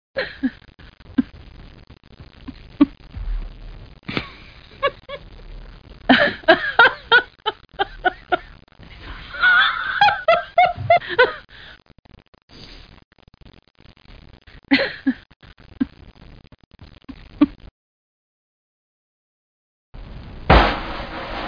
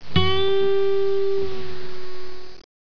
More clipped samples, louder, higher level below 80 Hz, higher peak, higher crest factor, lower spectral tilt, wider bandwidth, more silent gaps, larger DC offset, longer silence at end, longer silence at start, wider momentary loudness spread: neither; first, -19 LUFS vs -22 LUFS; first, -36 dBFS vs -44 dBFS; first, 0 dBFS vs -4 dBFS; about the same, 22 dB vs 18 dB; about the same, -6.5 dB/octave vs -7 dB/octave; about the same, 5.2 kHz vs 5.4 kHz; first, 11.99-12.03 s, 12.28-12.33 s, 12.43-12.48 s, 13.04-13.11 s, 15.36-15.40 s, 16.66-16.71 s, 17.71-19.93 s vs none; second, under 0.1% vs 10%; second, 0 s vs 0.2 s; first, 0.15 s vs 0 s; first, 25 LU vs 18 LU